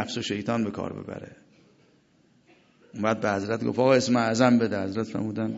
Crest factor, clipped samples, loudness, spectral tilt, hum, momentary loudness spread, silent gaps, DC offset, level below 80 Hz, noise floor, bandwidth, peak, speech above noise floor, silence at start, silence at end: 20 dB; under 0.1%; -25 LUFS; -5.5 dB/octave; none; 15 LU; none; under 0.1%; -60 dBFS; -62 dBFS; 8 kHz; -6 dBFS; 37 dB; 0 s; 0 s